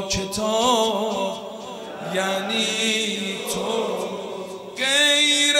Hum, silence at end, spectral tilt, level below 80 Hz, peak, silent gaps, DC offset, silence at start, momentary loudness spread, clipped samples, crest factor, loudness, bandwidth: none; 0 s; -2 dB/octave; -52 dBFS; -6 dBFS; none; under 0.1%; 0 s; 17 LU; under 0.1%; 18 dB; -21 LUFS; 16 kHz